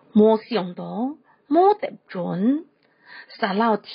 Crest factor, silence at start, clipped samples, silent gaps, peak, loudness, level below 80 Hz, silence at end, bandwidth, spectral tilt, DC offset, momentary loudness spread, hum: 16 dB; 0.15 s; under 0.1%; none; -6 dBFS; -22 LUFS; -72 dBFS; 0 s; 5.2 kHz; -5.5 dB/octave; under 0.1%; 13 LU; none